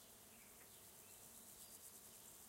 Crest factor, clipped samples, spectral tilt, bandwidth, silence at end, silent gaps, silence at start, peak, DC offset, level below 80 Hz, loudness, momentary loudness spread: 18 dB; under 0.1%; -1.5 dB/octave; 16 kHz; 0 s; none; 0 s; -44 dBFS; under 0.1%; -82 dBFS; -59 LUFS; 4 LU